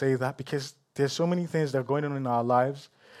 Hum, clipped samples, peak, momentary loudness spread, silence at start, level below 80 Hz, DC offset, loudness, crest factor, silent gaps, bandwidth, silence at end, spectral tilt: none; under 0.1%; -12 dBFS; 9 LU; 0 s; -76 dBFS; under 0.1%; -28 LUFS; 16 dB; none; 14 kHz; 0 s; -6.5 dB/octave